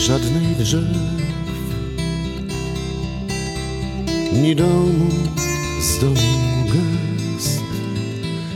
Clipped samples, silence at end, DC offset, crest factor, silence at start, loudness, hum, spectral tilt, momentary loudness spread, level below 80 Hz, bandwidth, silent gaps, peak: under 0.1%; 0 s; 0.1%; 16 dB; 0 s; -20 LUFS; none; -5.5 dB/octave; 9 LU; -32 dBFS; 17 kHz; none; -4 dBFS